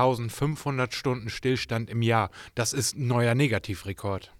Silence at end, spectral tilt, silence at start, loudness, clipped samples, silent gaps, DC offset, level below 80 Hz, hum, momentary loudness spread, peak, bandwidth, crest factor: 0.15 s; -5 dB/octave; 0 s; -27 LUFS; under 0.1%; none; under 0.1%; -56 dBFS; none; 8 LU; -10 dBFS; 16.5 kHz; 18 dB